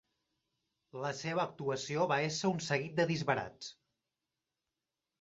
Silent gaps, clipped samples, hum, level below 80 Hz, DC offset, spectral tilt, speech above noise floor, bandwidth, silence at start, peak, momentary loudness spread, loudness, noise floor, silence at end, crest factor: none; under 0.1%; none; -74 dBFS; under 0.1%; -4 dB/octave; over 55 dB; 8 kHz; 0.95 s; -16 dBFS; 13 LU; -35 LUFS; under -90 dBFS; 1.5 s; 22 dB